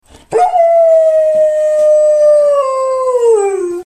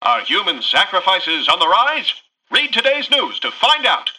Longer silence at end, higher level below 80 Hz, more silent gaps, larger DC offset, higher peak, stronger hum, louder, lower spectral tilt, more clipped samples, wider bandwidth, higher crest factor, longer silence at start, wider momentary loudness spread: about the same, 0 s vs 0.05 s; first, -54 dBFS vs -64 dBFS; neither; neither; about the same, -2 dBFS vs -2 dBFS; neither; first, -10 LUFS vs -15 LUFS; first, -4 dB/octave vs -1 dB/octave; neither; second, 10.5 kHz vs 12 kHz; second, 8 dB vs 14 dB; first, 0.3 s vs 0 s; about the same, 6 LU vs 5 LU